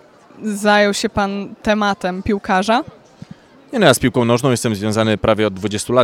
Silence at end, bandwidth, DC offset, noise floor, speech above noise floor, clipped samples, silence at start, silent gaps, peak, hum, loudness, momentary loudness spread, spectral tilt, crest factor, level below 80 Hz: 0 s; 16.5 kHz; under 0.1%; -40 dBFS; 24 dB; under 0.1%; 0.35 s; none; 0 dBFS; none; -17 LUFS; 9 LU; -5 dB/octave; 16 dB; -42 dBFS